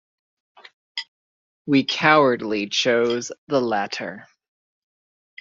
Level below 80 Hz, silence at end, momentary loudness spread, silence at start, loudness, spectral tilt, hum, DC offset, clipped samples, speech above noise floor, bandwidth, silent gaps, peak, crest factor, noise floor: -68 dBFS; 1.15 s; 17 LU; 0.95 s; -20 LUFS; -4 dB/octave; none; under 0.1%; under 0.1%; over 70 dB; 7.6 kHz; 1.08-1.65 s, 3.38-3.47 s; -2 dBFS; 20 dB; under -90 dBFS